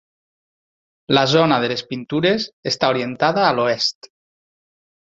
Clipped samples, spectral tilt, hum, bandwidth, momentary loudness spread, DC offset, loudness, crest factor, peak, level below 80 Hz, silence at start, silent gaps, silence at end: under 0.1%; -5 dB/octave; none; 7.8 kHz; 8 LU; under 0.1%; -18 LUFS; 20 dB; -2 dBFS; -60 dBFS; 1.1 s; 2.53-2.63 s; 1.15 s